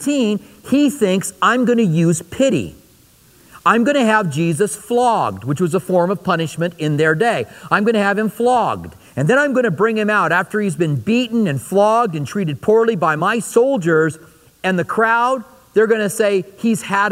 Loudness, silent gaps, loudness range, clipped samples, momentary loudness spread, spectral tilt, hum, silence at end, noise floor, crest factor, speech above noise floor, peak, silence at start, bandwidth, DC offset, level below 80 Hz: -17 LUFS; none; 1 LU; under 0.1%; 6 LU; -5.5 dB/octave; none; 0 s; -50 dBFS; 16 dB; 34 dB; 0 dBFS; 0 s; 16 kHz; under 0.1%; -56 dBFS